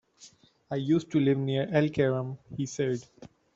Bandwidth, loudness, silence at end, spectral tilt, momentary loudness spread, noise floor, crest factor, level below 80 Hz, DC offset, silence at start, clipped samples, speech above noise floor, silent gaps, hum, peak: 8 kHz; -29 LUFS; 0.3 s; -7 dB/octave; 11 LU; -57 dBFS; 20 dB; -64 dBFS; under 0.1%; 0.2 s; under 0.1%; 29 dB; none; none; -10 dBFS